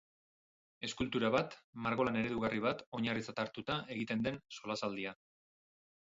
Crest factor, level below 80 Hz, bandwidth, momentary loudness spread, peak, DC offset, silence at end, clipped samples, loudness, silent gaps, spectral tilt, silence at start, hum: 20 dB; -66 dBFS; 7.6 kHz; 9 LU; -18 dBFS; under 0.1%; 0.9 s; under 0.1%; -38 LUFS; 1.64-1.73 s, 2.86-2.92 s; -4 dB/octave; 0.8 s; none